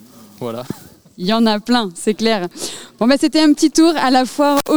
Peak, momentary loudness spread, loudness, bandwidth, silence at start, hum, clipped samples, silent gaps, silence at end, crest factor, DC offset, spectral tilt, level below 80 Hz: 0 dBFS; 15 LU; -15 LUFS; over 20 kHz; 0 s; none; under 0.1%; none; 0 s; 16 dB; 1%; -4 dB/octave; -52 dBFS